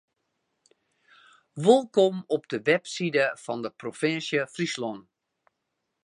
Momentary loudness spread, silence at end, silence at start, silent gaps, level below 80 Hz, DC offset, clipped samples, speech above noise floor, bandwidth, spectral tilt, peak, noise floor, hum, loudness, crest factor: 13 LU; 1.05 s; 1.55 s; none; -80 dBFS; under 0.1%; under 0.1%; 55 dB; 11 kHz; -5 dB/octave; -4 dBFS; -81 dBFS; none; -26 LUFS; 24 dB